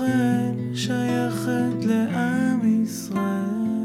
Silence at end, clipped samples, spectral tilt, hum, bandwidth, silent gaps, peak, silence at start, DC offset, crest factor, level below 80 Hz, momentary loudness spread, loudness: 0 s; under 0.1%; -6 dB/octave; none; 15.5 kHz; none; -12 dBFS; 0 s; under 0.1%; 10 dB; -64 dBFS; 5 LU; -23 LUFS